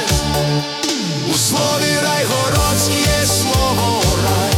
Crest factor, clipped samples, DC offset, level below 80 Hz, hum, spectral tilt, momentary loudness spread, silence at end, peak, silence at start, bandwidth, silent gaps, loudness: 12 dB; under 0.1%; under 0.1%; -28 dBFS; none; -3.5 dB/octave; 4 LU; 0 s; -4 dBFS; 0 s; 18 kHz; none; -15 LUFS